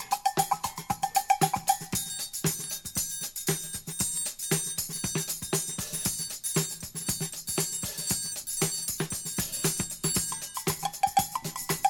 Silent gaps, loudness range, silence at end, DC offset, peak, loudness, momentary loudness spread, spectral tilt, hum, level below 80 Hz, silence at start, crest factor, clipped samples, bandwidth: none; 1 LU; 0 s; under 0.1%; -10 dBFS; -29 LUFS; 5 LU; -2.5 dB/octave; none; -56 dBFS; 0 s; 20 dB; under 0.1%; over 20 kHz